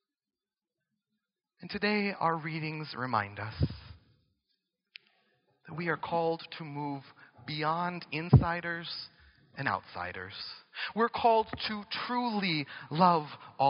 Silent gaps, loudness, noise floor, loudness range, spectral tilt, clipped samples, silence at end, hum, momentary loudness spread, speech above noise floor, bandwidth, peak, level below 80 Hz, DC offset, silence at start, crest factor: none; -32 LUFS; under -90 dBFS; 7 LU; -4.5 dB/octave; under 0.1%; 0 s; none; 16 LU; over 59 dB; 5.6 kHz; -8 dBFS; -52 dBFS; under 0.1%; 1.6 s; 24 dB